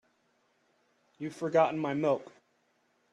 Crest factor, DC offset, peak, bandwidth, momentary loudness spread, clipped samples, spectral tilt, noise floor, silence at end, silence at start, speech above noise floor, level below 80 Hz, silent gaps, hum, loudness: 20 dB; under 0.1%; -14 dBFS; 11 kHz; 14 LU; under 0.1%; -7 dB/octave; -73 dBFS; 0.9 s; 1.2 s; 43 dB; -80 dBFS; none; none; -30 LUFS